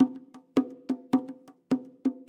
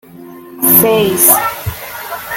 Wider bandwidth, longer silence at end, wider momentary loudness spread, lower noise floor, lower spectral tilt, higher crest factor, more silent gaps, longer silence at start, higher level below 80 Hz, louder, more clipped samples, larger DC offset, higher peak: second, 8.6 kHz vs over 20 kHz; about the same, 0.05 s vs 0 s; about the same, 16 LU vs 16 LU; first, -45 dBFS vs -33 dBFS; first, -7 dB/octave vs -3 dB/octave; about the same, 18 dB vs 14 dB; neither; second, 0 s vs 0.15 s; second, -78 dBFS vs -42 dBFS; second, -30 LUFS vs -9 LUFS; second, under 0.1% vs 0.4%; neither; second, -10 dBFS vs 0 dBFS